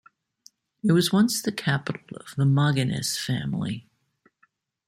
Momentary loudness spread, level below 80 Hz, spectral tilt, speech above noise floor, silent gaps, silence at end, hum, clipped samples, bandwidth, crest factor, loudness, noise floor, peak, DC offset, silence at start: 13 LU; -62 dBFS; -5 dB/octave; 43 dB; none; 1.1 s; none; under 0.1%; 16 kHz; 18 dB; -24 LUFS; -67 dBFS; -8 dBFS; under 0.1%; 0.85 s